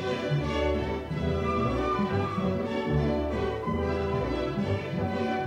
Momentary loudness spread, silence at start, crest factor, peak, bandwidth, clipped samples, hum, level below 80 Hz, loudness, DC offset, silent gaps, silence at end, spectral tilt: 3 LU; 0 s; 14 dB; -14 dBFS; 10.5 kHz; under 0.1%; none; -40 dBFS; -29 LUFS; under 0.1%; none; 0 s; -7.5 dB/octave